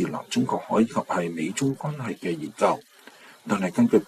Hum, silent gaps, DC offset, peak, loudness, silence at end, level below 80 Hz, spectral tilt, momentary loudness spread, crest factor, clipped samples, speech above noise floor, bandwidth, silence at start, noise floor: none; none; under 0.1%; -6 dBFS; -26 LUFS; 0.05 s; -66 dBFS; -6 dB/octave; 8 LU; 18 dB; under 0.1%; 25 dB; 14 kHz; 0 s; -50 dBFS